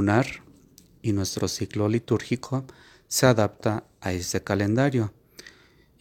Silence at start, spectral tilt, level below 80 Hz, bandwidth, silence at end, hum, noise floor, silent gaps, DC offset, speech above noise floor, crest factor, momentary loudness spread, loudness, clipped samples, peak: 0 s; -5.5 dB/octave; -58 dBFS; 18 kHz; 0.5 s; none; -57 dBFS; none; under 0.1%; 32 dB; 22 dB; 12 LU; -26 LUFS; under 0.1%; -4 dBFS